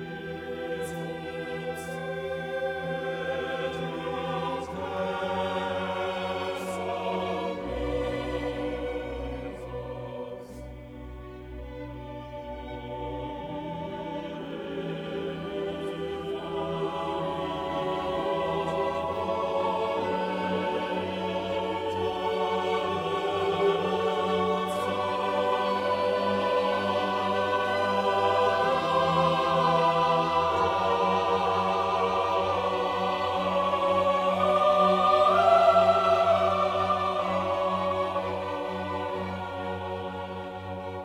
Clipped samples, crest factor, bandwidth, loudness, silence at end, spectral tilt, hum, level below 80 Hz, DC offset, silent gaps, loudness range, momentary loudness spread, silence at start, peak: under 0.1%; 18 dB; 16 kHz; -28 LUFS; 0 s; -5.5 dB/octave; none; -52 dBFS; under 0.1%; none; 13 LU; 13 LU; 0 s; -10 dBFS